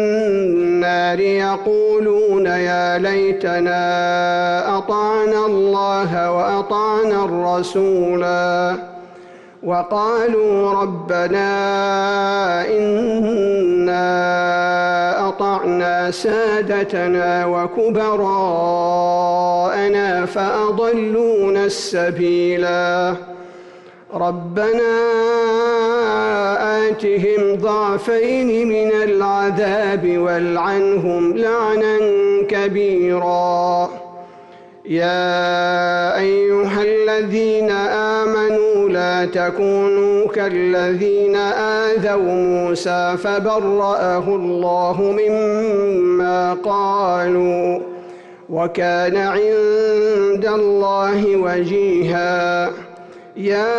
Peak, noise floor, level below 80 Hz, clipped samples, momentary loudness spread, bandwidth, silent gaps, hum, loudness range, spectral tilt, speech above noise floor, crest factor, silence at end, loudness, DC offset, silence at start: -8 dBFS; -41 dBFS; -56 dBFS; under 0.1%; 3 LU; 9.4 kHz; none; none; 2 LU; -6 dB/octave; 25 dB; 8 dB; 0 s; -17 LUFS; under 0.1%; 0 s